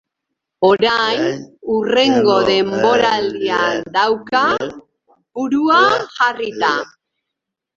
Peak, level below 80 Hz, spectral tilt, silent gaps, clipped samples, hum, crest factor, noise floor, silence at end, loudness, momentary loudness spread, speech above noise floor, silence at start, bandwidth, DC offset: 0 dBFS; -56 dBFS; -4 dB/octave; none; under 0.1%; none; 16 dB; -81 dBFS; 0.9 s; -15 LUFS; 9 LU; 65 dB; 0.6 s; 7.6 kHz; under 0.1%